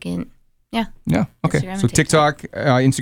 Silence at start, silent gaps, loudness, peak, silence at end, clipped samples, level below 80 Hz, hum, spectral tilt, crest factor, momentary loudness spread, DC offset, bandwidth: 0.05 s; none; -19 LUFS; -2 dBFS; 0 s; under 0.1%; -42 dBFS; none; -5.5 dB/octave; 16 dB; 11 LU; under 0.1%; 17 kHz